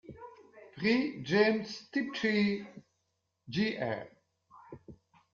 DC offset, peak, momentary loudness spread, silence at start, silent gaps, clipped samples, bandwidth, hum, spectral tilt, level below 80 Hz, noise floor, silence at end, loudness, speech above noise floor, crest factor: under 0.1%; -14 dBFS; 24 LU; 0.1 s; none; under 0.1%; 7.2 kHz; none; -4 dB/octave; -70 dBFS; -81 dBFS; 0.4 s; -32 LUFS; 50 dB; 20 dB